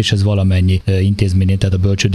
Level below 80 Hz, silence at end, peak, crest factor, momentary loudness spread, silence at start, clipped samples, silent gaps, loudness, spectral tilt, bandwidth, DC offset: -32 dBFS; 0 s; -2 dBFS; 12 dB; 1 LU; 0 s; under 0.1%; none; -14 LUFS; -6 dB/octave; 11 kHz; under 0.1%